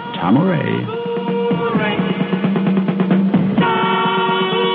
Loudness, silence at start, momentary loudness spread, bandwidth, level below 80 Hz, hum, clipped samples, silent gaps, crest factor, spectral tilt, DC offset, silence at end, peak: -17 LUFS; 0 s; 5 LU; 4.5 kHz; -54 dBFS; none; under 0.1%; none; 14 dB; -5 dB/octave; under 0.1%; 0 s; -4 dBFS